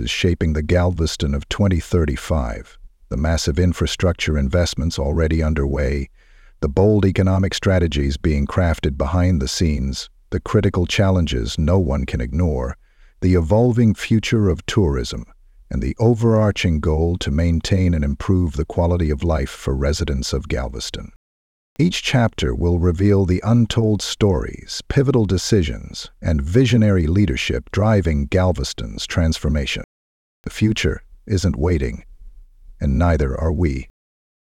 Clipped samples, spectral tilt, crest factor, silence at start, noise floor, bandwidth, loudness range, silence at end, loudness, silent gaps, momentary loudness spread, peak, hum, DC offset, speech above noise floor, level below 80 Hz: under 0.1%; -6 dB/octave; 16 dB; 0 s; -42 dBFS; 13.5 kHz; 4 LU; 0.55 s; -19 LUFS; 21.16-21.76 s, 29.84-30.44 s; 10 LU; -2 dBFS; none; under 0.1%; 24 dB; -28 dBFS